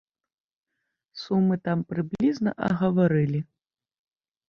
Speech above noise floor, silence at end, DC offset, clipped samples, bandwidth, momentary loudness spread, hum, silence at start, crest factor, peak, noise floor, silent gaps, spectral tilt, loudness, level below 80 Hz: 54 dB; 1.05 s; under 0.1%; under 0.1%; 6.8 kHz; 13 LU; none; 1.15 s; 18 dB; -10 dBFS; -78 dBFS; none; -8.5 dB/octave; -25 LUFS; -62 dBFS